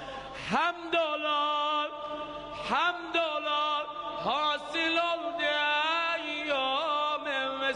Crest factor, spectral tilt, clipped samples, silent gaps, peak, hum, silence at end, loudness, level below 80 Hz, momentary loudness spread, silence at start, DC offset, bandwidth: 16 dB; -3 dB/octave; under 0.1%; none; -14 dBFS; none; 0 s; -29 LUFS; -64 dBFS; 9 LU; 0 s; under 0.1%; 10.5 kHz